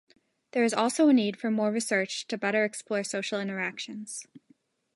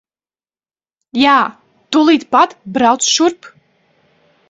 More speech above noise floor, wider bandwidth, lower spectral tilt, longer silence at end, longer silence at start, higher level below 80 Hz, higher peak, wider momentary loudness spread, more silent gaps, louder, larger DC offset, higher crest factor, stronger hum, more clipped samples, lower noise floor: second, 38 dB vs over 77 dB; first, 11.5 kHz vs 7.8 kHz; first, -4 dB/octave vs -2 dB/octave; second, 0.6 s vs 1 s; second, 0.55 s vs 1.15 s; second, -82 dBFS vs -60 dBFS; second, -12 dBFS vs 0 dBFS; first, 14 LU vs 6 LU; neither; second, -28 LUFS vs -13 LUFS; neither; about the same, 16 dB vs 16 dB; neither; neither; second, -66 dBFS vs under -90 dBFS